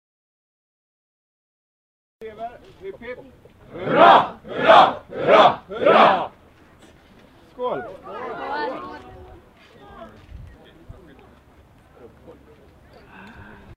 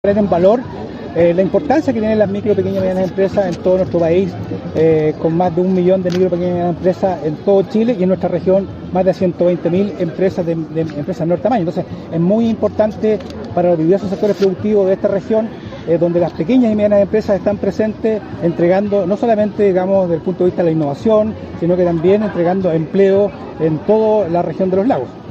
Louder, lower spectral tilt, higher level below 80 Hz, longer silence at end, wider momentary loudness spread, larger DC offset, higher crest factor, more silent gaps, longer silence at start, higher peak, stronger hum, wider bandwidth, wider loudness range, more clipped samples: about the same, -17 LUFS vs -15 LUFS; second, -5.5 dB/octave vs -8.5 dB/octave; second, -54 dBFS vs -46 dBFS; first, 3.4 s vs 0 s; first, 26 LU vs 7 LU; neither; first, 22 dB vs 14 dB; neither; first, 2.2 s vs 0.05 s; about the same, 0 dBFS vs 0 dBFS; neither; first, 9 kHz vs 7.8 kHz; first, 22 LU vs 2 LU; neither